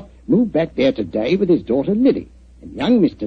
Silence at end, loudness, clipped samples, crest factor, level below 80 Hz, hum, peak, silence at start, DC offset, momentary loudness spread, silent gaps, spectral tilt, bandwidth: 0 s; -18 LUFS; under 0.1%; 14 dB; -44 dBFS; none; -4 dBFS; 0 s; under 0.1%; 7 LU; none; -8.5 dB/octave; 6.4 kHz